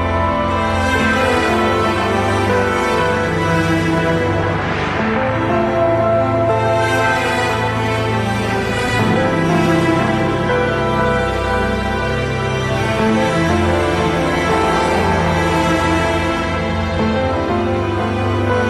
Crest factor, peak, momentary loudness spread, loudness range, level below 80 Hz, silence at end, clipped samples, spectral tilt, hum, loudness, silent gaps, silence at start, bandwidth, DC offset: 12 dB; -2 dBFS; 3 LU; 1 LU; -32 dBFS; 0 s; under 0.1%; -6 dB/octave; none; -16 LUFS; none; 0 s; 14 kHz; under 0.1%